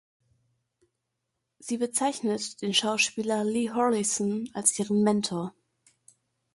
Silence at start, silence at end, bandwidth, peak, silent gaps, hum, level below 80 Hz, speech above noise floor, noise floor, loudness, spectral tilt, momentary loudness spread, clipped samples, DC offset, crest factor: 1.6 s; 1.05 s; 11.5 kHz; -8 dBFS; none; none; -72 dBFS; 55 dB; -82 dBFS; -27 LUFS; -3 dB/octave; 7 LU; under 0.1%; under 0.1%; 22 dB